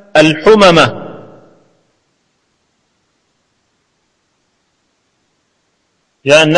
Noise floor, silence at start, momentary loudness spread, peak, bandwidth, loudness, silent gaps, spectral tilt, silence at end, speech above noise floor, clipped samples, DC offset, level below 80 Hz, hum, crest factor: -62 dBFS; 0.15 s; 24 LU; 0 dBFS; 11 kHz; -8 LUFS; none; -4.5 dB/octave; 0 s; 56 dB; 0.5%; under 0.1%; -46 dBFS; none; 14 dB